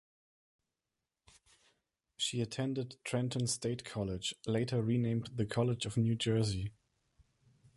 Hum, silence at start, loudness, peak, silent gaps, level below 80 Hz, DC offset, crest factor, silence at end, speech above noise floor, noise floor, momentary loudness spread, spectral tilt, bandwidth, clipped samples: none; 2.2 s; -35 LUFS; -20 dBFS; none; -60 dBFS; under 0.1%; 18 dB; 1.05 s; 55 dB; -90 dBFS; 6 LU; -5.5 dB/octave; 11.5 kHz; under 0.1%